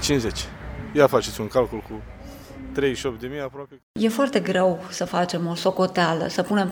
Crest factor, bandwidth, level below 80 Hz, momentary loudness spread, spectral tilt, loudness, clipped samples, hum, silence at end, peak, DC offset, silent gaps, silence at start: 22 dB; over 20 kHz; -44 dBFS; 17 LU; -5 dB/octave; -23 LUFS; under 0.1%; none; 0 s; -2 dBFS; under 0.1%; 3.83-3.95 s; 0 s